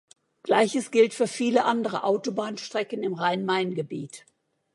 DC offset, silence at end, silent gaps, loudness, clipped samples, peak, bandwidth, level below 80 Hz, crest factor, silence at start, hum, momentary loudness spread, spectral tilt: under 0.1%; 0.55 s; none; -25 LUFS; under 0.1%; -8 dBFS; 11.5 kHz; -80 dBFS; 18 dB; 0.45 s; none; 10 LU; -4.5 dB/octave